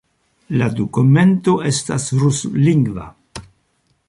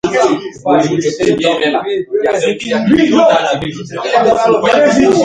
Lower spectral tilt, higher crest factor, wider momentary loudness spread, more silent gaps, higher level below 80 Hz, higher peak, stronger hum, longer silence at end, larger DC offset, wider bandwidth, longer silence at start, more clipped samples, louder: about the same, -6 dB/octave vs -5 dB/octave; about the same, 14 dB vs 12 dB; first, 21 LU vs 8 LU; neither; about the same, -48 dBFS vs -46 dBFS; about the same, -2 dBFS vs 0 dBFS; neither; first, 0.65 s vs 0 s; neither; about the same, 11.5 kHz vs 10.5 kHz; first, 0.5 s vs 0.05 s; neither; second, -16 LUFS vs -12 LUFS